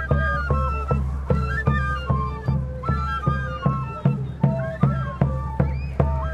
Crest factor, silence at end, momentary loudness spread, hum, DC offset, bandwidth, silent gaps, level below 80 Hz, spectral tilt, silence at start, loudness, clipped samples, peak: 18 dB; 0 s; 3 LU; none; under 0.1%; 6.8 kHz; none; -30 dBFS; -9 dB/octave; 0 s; -24 LUFS; under 0.1%; -4 dBFS